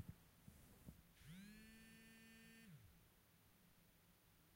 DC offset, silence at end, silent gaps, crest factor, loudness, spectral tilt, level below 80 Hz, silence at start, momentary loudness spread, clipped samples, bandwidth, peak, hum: under 0.1%; 0 s; none; 24 dB; -64 LUFS; -4.5 dB/octave; -76 dBFS; 0 s; 6 LU; under 0.1%; 16 kHz; -40 dBFS; none